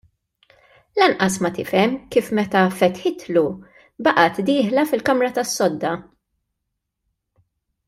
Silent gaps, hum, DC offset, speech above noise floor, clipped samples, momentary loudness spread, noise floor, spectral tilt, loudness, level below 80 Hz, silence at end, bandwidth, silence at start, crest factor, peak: none; none; under 0.1%; 59 dB; under 0.1%; 9 LU; -78 dBFS; -4.5 dB/octave; -19 LUFS; -60 dBFS; 1.85 s; 16 kHz; 0.95 s; 20 dB; -2 dBFS